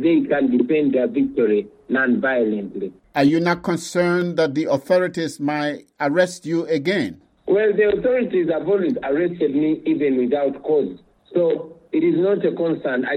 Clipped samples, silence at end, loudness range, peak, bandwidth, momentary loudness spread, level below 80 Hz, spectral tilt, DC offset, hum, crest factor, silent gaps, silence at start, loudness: under 0.1%; 0 s; 1 LU; -6 dBFS; 14 kHz; 7 LU; -58 dBFS; -6.5 dB/octave; under 0.1%; none; 14 dB; none; 0 s; -20 LUFS